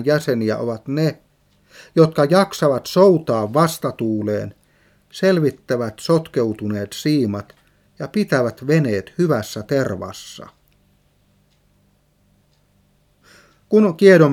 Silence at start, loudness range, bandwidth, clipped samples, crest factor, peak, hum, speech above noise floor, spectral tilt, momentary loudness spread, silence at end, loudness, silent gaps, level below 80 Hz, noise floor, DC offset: 0 s; 8 LU; 17 kHz; under 0.1%; 20 dB; 0 dBFS; 50 Hz at -50 dBFS; 42 dB; -6.5 dB/octave; 11 LU; 0 s; -18 LUFS; none; -60 dBFS; -59 dBFS; under 0.1%